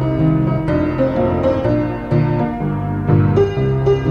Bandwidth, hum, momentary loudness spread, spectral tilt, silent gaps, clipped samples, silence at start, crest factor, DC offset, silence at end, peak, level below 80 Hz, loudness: 6.8 kHz; none; 4 LU; -10 dB/octave; none; under 0.1%; 0 s; 14 dB; under 0.1%; 0 s; -2 dBFS; -32 dBFS; -17 LUFS